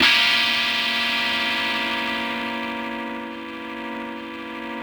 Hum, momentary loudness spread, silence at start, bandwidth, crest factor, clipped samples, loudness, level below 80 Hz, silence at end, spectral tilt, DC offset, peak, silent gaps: none; 15 LU; 0 s; over 20 kHz; 20 dB; under 0.1%; -21 LUFS; -58 dBFS; 0 s; -1.5 dB/octave; under 0.1%; -4 dBFS; none